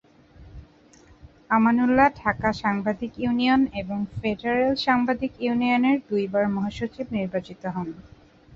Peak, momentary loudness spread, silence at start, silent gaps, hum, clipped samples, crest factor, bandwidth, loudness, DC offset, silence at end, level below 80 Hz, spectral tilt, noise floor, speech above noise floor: -4 dBFS; 11 LU; 0.4 s; none; none; under 0.1%; 20 dB; 7.4 kHz; -24 LUFS; under 0.1%; 0 s; -50 dBFS; -7 dB/octave; -53 dBFS; 30 dB